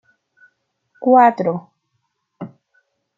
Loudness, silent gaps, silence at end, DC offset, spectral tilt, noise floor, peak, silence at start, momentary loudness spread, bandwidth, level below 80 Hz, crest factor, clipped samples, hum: -15 LUFS; none; 0.7 s; under 0.1%; -9 dB/octave; -72 dBFS; -2 dBFS; 1 s; 24 LU; 7.2 kHz; -72 dBFS; 18 dB; under 0.1%; none